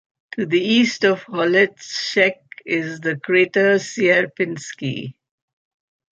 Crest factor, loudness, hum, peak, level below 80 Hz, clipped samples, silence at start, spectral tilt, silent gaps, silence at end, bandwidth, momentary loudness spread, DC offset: 18 dB; -19 LUFS; none; -2 dBFS; -68 dBFS; under 0.1%; 0.35 s; -4.5 dB/octave; none; 1.05 s; 8.8 kHz; 12 LU; under 0.1%